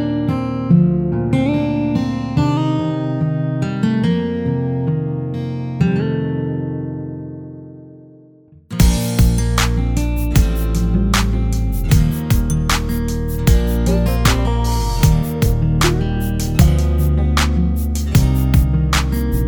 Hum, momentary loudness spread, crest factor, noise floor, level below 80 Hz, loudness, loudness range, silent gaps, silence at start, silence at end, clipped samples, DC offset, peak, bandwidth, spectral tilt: none; 7 LU; 16 dB; -46 dBFS; -20 dBFS; -17 LUFS; 5 LU; none; 0 s; 0 s; under 0.1%; under 0.1%; 0 dBFS; over 20 kHz; -6 dB/octave